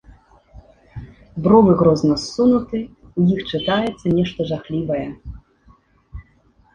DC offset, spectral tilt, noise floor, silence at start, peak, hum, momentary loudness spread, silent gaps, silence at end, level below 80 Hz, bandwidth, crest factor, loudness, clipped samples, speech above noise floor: under 0.1%; -7 dB/octave; -56 dBFS; 0.55 s; -2 dBFS; none; 24 LU; none; 0.55 s; -44 dBFS; 9.8 kHz; 18 dB; -18 LUFS; under 0.1%; 39 dB